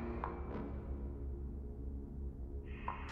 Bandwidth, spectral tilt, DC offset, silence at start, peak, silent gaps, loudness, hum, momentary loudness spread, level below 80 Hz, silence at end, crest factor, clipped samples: 5 kHz; -9 dB/octave; under 0.1%; 0 s; -26 dBFS; none; -46 LUFS; none; 4 LU; -46 dBFS; 0 s; 18 dB; under 0.1%